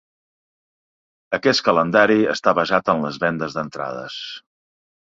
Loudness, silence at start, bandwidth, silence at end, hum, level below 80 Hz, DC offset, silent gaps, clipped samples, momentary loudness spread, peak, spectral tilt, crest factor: -19 LUFS; 1.3 s; 7.8 kHz; 0.7 s; none; -60 dBFS; under 0.1%; none; under 0.1%; 15 LU; 0 dBFS; -5 dB/octave; 20 dB